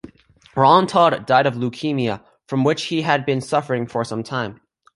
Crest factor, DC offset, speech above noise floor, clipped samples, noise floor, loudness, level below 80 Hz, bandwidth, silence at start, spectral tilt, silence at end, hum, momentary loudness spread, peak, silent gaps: 18 dB; under 0.1%; 33 dB; under 0.1%; -51 dBFS; -19 LUFS; -60 dBFS; 11.5 kHz; 0.05 s; -6 dB/octave; 0.4 s; none; 12 LU; -2 dBFS; none